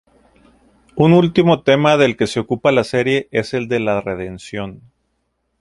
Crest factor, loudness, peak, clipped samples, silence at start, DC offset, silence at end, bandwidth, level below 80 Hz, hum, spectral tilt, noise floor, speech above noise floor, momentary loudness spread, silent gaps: 16 dB; -16 LUFS; 0 dBFS; under 0.1%; 0.95 s; under 0.1%; 0.85 s; 11.5 kHz; -50 dBFS; none; -6.5 dB/octave; -69 dBFS; 53 dB; 15 LU; none